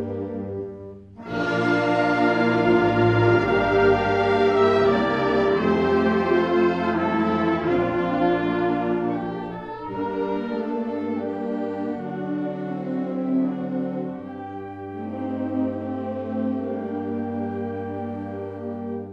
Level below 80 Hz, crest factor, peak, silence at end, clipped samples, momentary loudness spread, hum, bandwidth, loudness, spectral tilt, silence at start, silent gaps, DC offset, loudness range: -50 dBFS; 16 dB; -6 dBFS; 0 s; under 0.1%; 13 LU; none; 8.2 kHz; -23 LUFS; -8 dB/octave; 0 s; none; under 0.1%; 9 LU